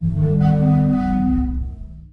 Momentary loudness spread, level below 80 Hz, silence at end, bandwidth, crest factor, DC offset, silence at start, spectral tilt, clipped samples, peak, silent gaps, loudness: 14 LU; -28 dBFS; 0.1 s; 4.7 kHz; 12 dB; under 0.1%; 0 s; -11 dB/octave; under 0.1%; -6 dBFS; none; -18 LUFS